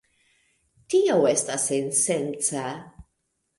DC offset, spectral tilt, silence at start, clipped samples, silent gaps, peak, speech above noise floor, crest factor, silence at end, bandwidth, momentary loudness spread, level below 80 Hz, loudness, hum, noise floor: under 0.1%; -3.5 dB/octave; 0.9 s; under 0.1%; none; -8 dBFS; 52 dB; 18 dB; 0.55 s; 11.5 kHz; 11 LU; -62 dBFS; -23 LUFS; none; -76 dBFS